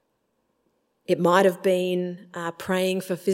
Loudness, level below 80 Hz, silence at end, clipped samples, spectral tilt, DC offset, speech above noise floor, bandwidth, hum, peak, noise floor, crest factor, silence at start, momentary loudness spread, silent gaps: -24 LUFS; -72 dBFS; 0 s; under 0.1%; -5.5 dB/octave; under 0.1%; 50 dB; 16.5 kHz; none; -4 dBFS; -73 dBFS; 20 dB; 1.1 s; 14 LU; none